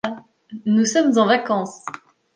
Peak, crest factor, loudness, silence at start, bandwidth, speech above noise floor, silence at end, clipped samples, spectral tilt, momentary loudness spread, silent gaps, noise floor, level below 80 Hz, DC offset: -4 dBFS; 16 dB; -19 LUFS; 0.05 s; 9.8 kHz; 20 dB; 0.45 s; under 0.1%; -4.5 dB/octave; 22 LU; none; -38 dBFS; -70 dBFS; under 0.1%